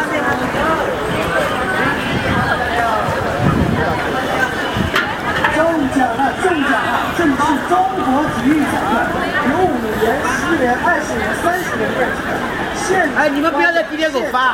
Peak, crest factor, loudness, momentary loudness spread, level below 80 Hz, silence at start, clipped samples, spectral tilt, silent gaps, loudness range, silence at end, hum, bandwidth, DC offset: 0 dBFS; 16 dB; -16 LUFS; 4 LU; -38 dBFS; 0 s; under 0.1%; -5 dB/octave; none; 1 LU; 0 s; none; 16.5 kHz; under 0.1%